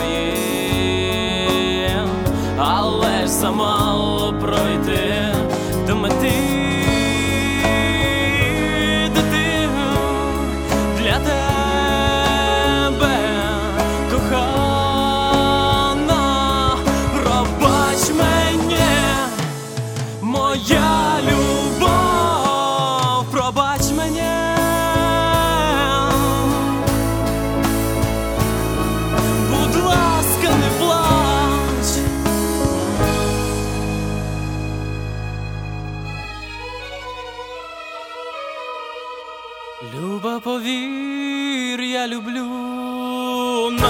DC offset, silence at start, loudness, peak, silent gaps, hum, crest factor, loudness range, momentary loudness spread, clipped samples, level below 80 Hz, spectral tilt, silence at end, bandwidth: under 0.1%; 0 s; -18 LUFS; 0 dBFS; none; none; 18 dB; 10 LU; 12 LU; under 0.1%; -30 dBFS; -4.5 dB/octave; 0 s; 19.5 kHz